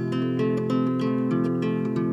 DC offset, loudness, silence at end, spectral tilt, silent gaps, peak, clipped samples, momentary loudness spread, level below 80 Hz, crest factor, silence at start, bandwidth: under 0.1%; -25 LUFS; 0 s; -9 dB/octave; none; -12 dBFS; under 0.1%; 2 LU; -74 dBFS; 12 dB; 0 s; 7.8 kHz